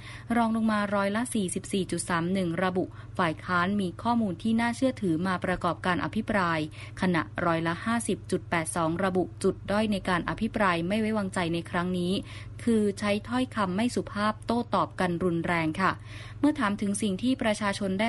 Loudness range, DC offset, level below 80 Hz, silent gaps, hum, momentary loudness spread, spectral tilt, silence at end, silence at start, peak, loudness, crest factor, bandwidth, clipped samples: 1 LU; under 0.1%; -52 dBFS; none; none; 4 LU; -5.5 dB/octave; 0 s; 0 s; -10 dBFS; -28 LUFS; 18 dB; 11.5 kHz; under 0.1%